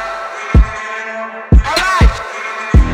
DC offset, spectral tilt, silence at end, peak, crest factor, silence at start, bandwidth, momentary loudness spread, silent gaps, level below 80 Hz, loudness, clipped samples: under 0.1%; -5.5 dB/octave; 0 s; 0 dBFS; 12 dB; 0 s; 10.5 kHz; 11 LU; none; -14 dBFS; -15 LUFS; under 0.1%